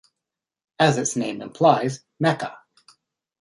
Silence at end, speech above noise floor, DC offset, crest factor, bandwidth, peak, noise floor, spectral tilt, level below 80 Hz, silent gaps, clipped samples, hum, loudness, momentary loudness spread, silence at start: 0.85 s; 65 dB; under 0.1%; 22 dB; 11.5 kHz; -2 dBFS; -86 dBFS; -4.5 dB/octave; -66 dBFS; none; under 0.1%; none; -22 LUFS; 11 LU; 0.8 s